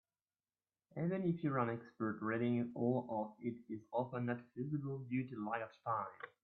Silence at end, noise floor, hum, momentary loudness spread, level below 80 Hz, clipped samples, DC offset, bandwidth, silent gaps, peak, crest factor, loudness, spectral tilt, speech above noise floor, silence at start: 0.15 s; under -90 dBFS; none; 7 LU; -82 dBFS; under 0.1%; under 0.1%; 4.4 kHz; none; -22 dBFS; 18 dB; -41 LUFS; -8 dB/octave; over 50 dB; 0.95 s